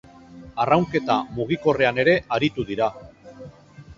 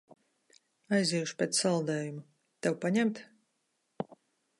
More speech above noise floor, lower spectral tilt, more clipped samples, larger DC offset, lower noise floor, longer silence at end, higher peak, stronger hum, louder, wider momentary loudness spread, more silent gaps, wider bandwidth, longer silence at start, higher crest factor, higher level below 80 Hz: second, 24 dB vs 48 dB; first, -6.5 dB/octave vs -4.5 dB/octave; neither; neither; second, -45 dBFS vs -79 dBFS; second, 0.05 s vs 0.45 s; first, -2 dBFS vs -14 dBFS; neither; first, -22 LUFS vs -31 LUFS; second, 9 LU vs 14 LU; neither; second, 7.6 kHz vs 11.5 kHz; second, 0.3 s vs 0.9 s; about the same, 22 dB vs 20 dB; first, -52 dBFS vs -80 dBFS